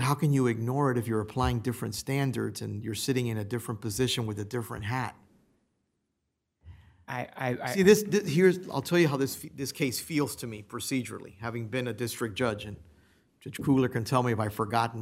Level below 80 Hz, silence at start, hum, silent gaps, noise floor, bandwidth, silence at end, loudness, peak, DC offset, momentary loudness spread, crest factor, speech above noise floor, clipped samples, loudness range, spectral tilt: -54 dBFS; 0 s; none; none; -81 dBFS; 16 kHz; 0 s; -29 LUFS; -8 dBFS; under 0.1%; 13 LU; 22 dB; 53 dB; under 0.1%; 8 LU; -5.5 dB/octave